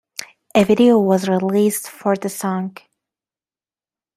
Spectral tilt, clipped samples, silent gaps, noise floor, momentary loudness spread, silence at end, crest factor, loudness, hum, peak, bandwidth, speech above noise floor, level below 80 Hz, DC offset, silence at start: -5.5 dB/octave; under 0.1%; none; under -90 dBFS; 15 LU; 1.45 s; 18 dB; -17 LUFS; none; -2 dBFS; 15.5 kHz; over 74 dB; -60 dBFS; under 0.1%; 0.2 s